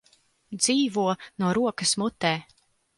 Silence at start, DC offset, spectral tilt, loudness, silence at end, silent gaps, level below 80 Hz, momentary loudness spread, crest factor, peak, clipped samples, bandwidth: 0.5 s; under 0.1%; -3.5 dB/octave; -25 LUFS; 0.55 s; none; -64 dBFS; 6 LU; 20 dB; -8 dBFS; under 0.1%; 11.5 kHz